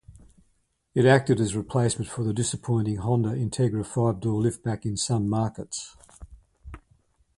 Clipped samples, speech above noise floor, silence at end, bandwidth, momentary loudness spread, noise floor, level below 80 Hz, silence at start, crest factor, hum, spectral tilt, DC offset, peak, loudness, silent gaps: under 0.1%; 45 dB; 0.6 s; 11.5 kHz; 10 LU; -69 dBFS; -50 dBFS; 0.1 s; 22 dB; none; -6 dB/octave; under 0.1%; -4 dBFS; -26 LUFS; none